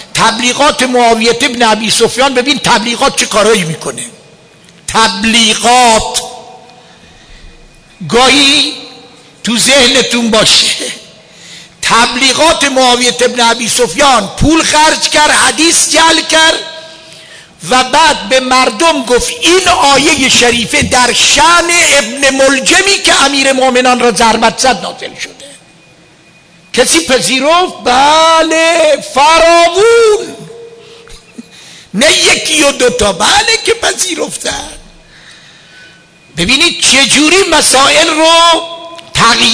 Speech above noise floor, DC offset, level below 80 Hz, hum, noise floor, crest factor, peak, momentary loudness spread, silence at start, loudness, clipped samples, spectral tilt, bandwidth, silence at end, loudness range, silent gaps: 34 dB; under 0.1%; -34 dBFS; none; -41 dBFS; 10 dB; 0 dBFS; 11 LU; 0 s; -7 LUFS; 0.1%; -1.5 dB/octave; 11 kHz; 0 s; 5 LU; none